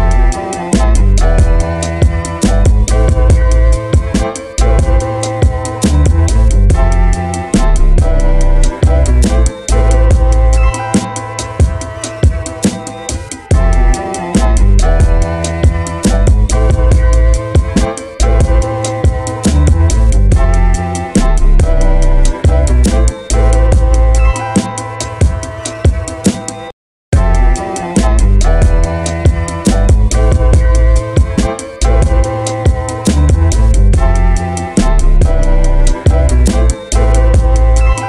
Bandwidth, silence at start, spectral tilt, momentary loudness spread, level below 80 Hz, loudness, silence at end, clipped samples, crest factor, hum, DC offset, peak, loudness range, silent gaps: 11.5 kHz; 0 s; -6 dB/octave; 5 LU; -10 dBFS; -12 LUFS; 0 s; under 0.1%; 8 dB; none; 0.2%; 0 dBFS; 2 LU; 26.73-27.12 s